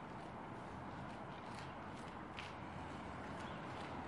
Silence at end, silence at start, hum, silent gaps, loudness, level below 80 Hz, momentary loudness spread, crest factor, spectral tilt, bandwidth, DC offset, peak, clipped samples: 0 s; 0 s; none; none; -50 LUFS; -66 dBFS; 2 LU; 18 dB; -6 dB/octave; 11.5 kHz; under 0.1%; -30 dBFS; under 0.1%